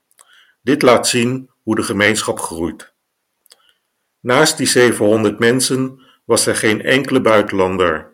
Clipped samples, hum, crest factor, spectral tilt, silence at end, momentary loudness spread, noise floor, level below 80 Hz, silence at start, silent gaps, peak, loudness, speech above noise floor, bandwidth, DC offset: under 0.1%; none; 16 dB; -3.5 dB/octave; 0.1 s; 11 LU; -71 dBFS; -52 dBFS; 0.65 s; none; 0 dBFS; -15 LUFS; 57 dB; 17 kHz; under 0.1%